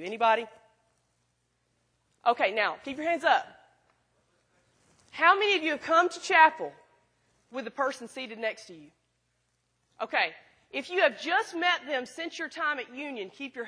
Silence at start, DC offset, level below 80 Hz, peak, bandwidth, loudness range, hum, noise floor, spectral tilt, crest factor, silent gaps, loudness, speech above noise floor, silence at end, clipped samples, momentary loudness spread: 0 s; under 0.1%; -80 dBFS; -6 dBFS; 10.5 kHz; 9 LU; none; -75 dBFS; -2 dB/octave; 24 dB; none; -27 LUFS; 47 dB; 0 s; under 0.1%; 17 LU